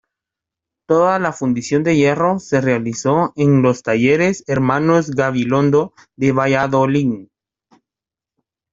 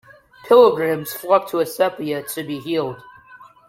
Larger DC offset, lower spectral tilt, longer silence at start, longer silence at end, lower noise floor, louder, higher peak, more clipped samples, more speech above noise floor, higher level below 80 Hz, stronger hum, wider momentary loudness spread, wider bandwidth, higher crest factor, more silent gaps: neither; first, -6.5 dB/octave vs -5 dB/octave; first, 0.9 s vs 0.45 s; first, 1.5 s vs 0.25 s; first, -88 dBFS vs -46 dBFS; first, -16 LUFS vs -19 LUFS; about the same, -2 dBFS vs -2 dBFS; neither; first, 73 dB vs 28 dB; first, -54 dBFS vs -64 dBFS; neither; second, 4 LU vs 14 LU; second, 7.8 kHz vs 16.5 kHz; about the same, 16 dB vs 18 dB; neither